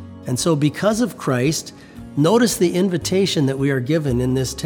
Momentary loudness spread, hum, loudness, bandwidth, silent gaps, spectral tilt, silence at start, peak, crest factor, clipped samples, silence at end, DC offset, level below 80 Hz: 9 LU; none; -19 LUFS; 19.5 kHz; none; -5.5 dB/octave; 0 s; -4 dBFS; 16 dB; under 0.1%; 0 s; under 0.1%; -44 dBFS